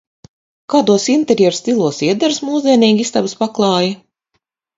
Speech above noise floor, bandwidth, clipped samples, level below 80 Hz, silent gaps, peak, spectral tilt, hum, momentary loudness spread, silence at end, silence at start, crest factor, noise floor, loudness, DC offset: 56 dB; 7.8 kHz; under 0.1%; -60 dBFS; none; 0 dBFS; -4.5 dB/octave; none; 6 LU; 0.8 s; 0.7 s; 16 dB; -69 dBFS; -14 LUFS; under 0.1%